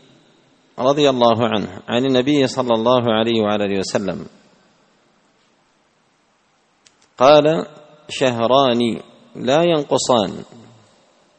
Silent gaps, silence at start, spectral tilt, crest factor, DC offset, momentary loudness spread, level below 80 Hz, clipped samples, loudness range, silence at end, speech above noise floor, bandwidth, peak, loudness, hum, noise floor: none; 0.75 s; -5 dB/octave; 18 dB; under 0.1%; 13 LU; -58 dBFS; under 0.1%; 8 LU; 0.95 s; 44 dB; 8.8 kHz; 0 dBFS; -17 LUFS; none; -60 dBFS